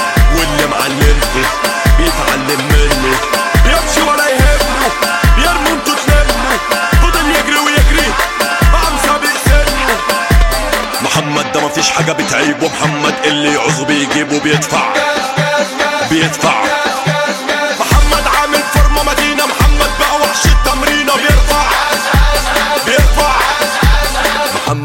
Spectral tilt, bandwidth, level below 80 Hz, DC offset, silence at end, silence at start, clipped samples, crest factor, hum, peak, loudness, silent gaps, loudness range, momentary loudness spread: -3.5 dB/octave; 17 kHz; -16 dBFS; under 0.1%; 0 s; 0 s; under 0.1%; 10 dB; none; 0 dBFS; -11 LUFS; none; 2 LU; 3 LU